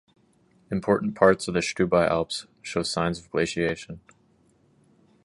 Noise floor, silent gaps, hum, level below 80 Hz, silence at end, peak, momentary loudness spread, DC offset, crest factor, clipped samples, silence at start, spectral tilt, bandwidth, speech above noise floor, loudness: -63 dBFS; none; none; -52 dBFS; 1.25 s; -2 dBFS; 12 LU; under 0.1%; 24 dB; under 0.1%; 0.7 s; -5 dB/octave; 11.5 kHz; 38 dB; -25 LUFS